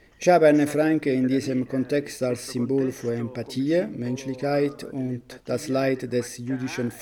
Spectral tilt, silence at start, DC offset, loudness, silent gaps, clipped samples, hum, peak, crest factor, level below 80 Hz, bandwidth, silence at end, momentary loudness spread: -6 dB/octave; 0.2 s; under 0.1%; -25 LUFS; none; under 0.1%; none; -6 dBFS; 18 dB; -62 dBFS; 19 kHz; 0 s; 11 LU